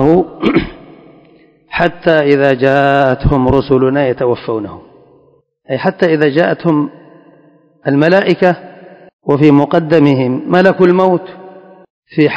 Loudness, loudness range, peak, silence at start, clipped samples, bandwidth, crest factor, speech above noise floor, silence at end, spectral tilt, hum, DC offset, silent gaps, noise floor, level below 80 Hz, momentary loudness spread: -12 LUFS; 4 LU; 0 dBFS; 0 s; 0.7%; 8 kHz; 12 dB; 40 dB; 0 s; -8.5 dB/octave; none; under 0.1%; 9.13-9.19 s, 11.90-12.03 s; -51 dBFS; -34 dBFS; 13 LU